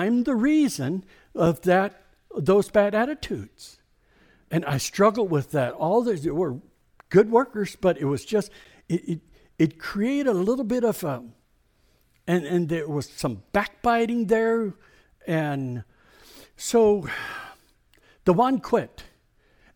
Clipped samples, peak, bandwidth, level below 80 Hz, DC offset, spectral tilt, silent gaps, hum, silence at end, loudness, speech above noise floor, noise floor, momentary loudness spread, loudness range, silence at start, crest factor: under 0.1%; -6 dBFS; 19 kHz; -54 dBFS; under 0.1%; -6 dB/octave; none; none; 0.75 s; -24 LUFS; 40 dB; -64 dBFS; 13 LU; 4 LU; 0 s; 18 dB